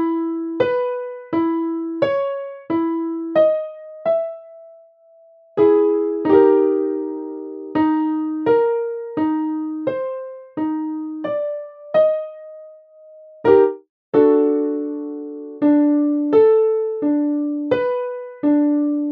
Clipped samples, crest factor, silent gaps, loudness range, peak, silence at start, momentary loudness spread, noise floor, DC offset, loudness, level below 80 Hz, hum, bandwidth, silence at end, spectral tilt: under 0.1%; 18 dB; 13.89-14.12 s; 5 LU; -2 dBFS; 0 s; 14 LU; -50 dBFS; under 0.1%; -19 LUFS; -64 dBFS; none; 4.9 kHz; 0 s; -9.5 dB/octave